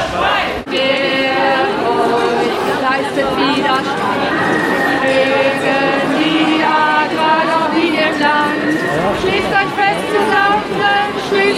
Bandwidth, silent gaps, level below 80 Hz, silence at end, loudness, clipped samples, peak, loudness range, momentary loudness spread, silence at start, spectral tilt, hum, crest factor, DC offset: 15.5 kHz; none; -44 dBFS; 0 s; -14 LUFS; under 0.1%; 0 dBFS; 2 LU; 3 LU; 0 s; -4.5 dB/octave; none; 14 dB; under 0.1%